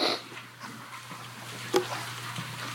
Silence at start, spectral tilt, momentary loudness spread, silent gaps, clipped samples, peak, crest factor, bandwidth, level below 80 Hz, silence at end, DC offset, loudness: 0 s; -3.5 dB/octave; 13 LU; none; under 0.1%; -10 dBFS; 24 dB; 17 kHz; -78 dBFS; 0 s; under 0.1%; -34 LUFS